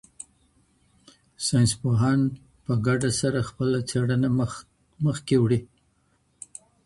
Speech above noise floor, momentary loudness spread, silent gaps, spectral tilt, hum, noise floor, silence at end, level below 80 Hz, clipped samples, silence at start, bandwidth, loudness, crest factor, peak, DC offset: 44 dB; 20 LU; none; -6 dB/octave; none; -67 dBFS; 1.2 s; -54 dBFS; under 0.1%; 1.4 s; 11.5 kHz; -24 LUFS; 16 dB; -10 dBFS; under 0.1%